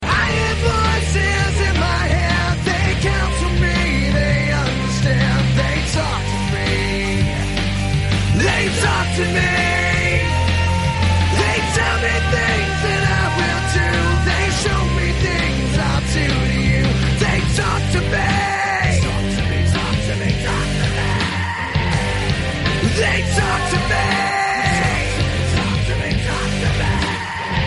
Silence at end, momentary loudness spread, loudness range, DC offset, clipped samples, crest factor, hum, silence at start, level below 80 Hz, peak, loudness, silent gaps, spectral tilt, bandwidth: 0 s; 3 LU; 2 LU; under 0.1%; under 0.1%; 14 dB; none; 0 s; -24 dBFS; -2 dBFS; -17 LUFS; none; -5 dB/octave; 11.5 kHz